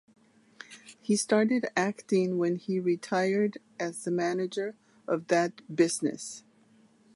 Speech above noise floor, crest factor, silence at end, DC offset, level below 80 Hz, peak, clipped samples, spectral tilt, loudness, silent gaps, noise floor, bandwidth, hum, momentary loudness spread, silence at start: 33 dB; 18 dB; 0.75 s; under 0.1%; -80 dBFS; -10 dBFS; under 0.1%; -5 dB/octave; -29 LUFS; none; -62 dBFS; 11.5 kHz; none; 15 LU; 0.6 s